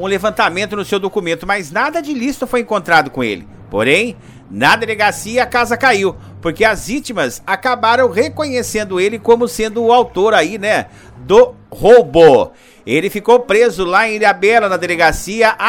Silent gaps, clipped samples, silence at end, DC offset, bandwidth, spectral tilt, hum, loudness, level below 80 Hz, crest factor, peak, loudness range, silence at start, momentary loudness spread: none; 0.3%; 0 s; under 0.1%; 17 kHz; -4 dB/octave; none; -13 LUFS; -40 dBFS; 14 dB; 0 dBFS; 5 LU; 0 s; 9 LU